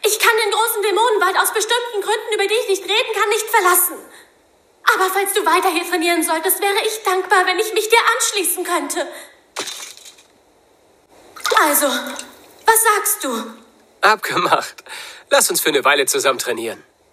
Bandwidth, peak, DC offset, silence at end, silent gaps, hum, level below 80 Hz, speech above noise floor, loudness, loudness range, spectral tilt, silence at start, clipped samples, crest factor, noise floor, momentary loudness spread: 16 kHz; 0 dBFS; under 0.1%; 0.35 s; none; none; -68 dBFS; 37 dB; -16 LUFS; 5 LU; -0.5 dB/octave; 0 s; under 0.1%; 18 dB; -55 dBFS; 15 LU